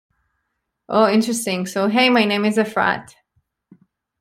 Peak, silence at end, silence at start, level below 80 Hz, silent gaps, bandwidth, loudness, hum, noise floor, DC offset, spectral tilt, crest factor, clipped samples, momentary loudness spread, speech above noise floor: -2 dBFS; 1.2 s; 0.9 s; -64 dBFS; none; 16 kHz; -18 LUFS; none; -75 dBFS; under 0.1%; -4 dB/octave; 18 dB; under 0.1%; 7 LU; 58 dB